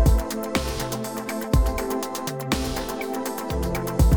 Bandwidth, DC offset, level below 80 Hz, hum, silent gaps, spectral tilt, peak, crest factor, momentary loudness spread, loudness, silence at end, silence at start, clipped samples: over 20 kHz; 0.2%; -26 dBFS; none; none; -5.5 dB/octave; -6 dBFS; 16 dB; 6 LU; -26 LUFS; 0 s; 0 s; under 0.1%